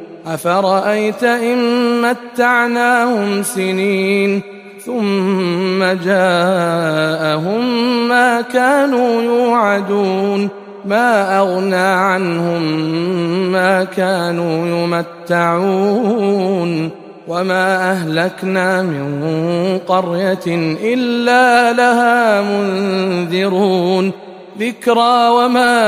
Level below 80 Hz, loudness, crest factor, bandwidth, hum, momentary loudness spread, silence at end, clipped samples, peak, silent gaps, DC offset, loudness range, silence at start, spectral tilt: -62 dBFS; -14 LUFS; 14 dB; 15.5 kHz; none; 7 LU; 0 s; under 0.1%; 0 dBFS; none; under 0.1%; 3 LU; 0 s; -5.5 dB/octave